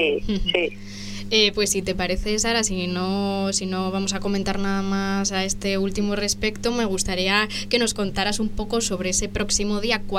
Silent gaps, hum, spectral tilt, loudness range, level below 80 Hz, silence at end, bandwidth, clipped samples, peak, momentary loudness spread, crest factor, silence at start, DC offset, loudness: none; none; -3 dB/octave; 2 LU; -36 dBFS; 0 s; 15.5 kHz; under 0.1%; -4 dBFS; 5 LU; 20 dB; 0 s; under 0.1%; -23 LUFS